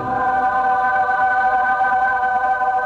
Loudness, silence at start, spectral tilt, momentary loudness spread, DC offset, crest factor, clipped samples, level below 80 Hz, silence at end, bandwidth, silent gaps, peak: -17 LUFS; 0 s; -5.5 dB/octave; 2 LU; under 0.1%; 8 dB; under 0.1%; -50 dBFS; 0 s; 7 kHz; none; -8 dBFS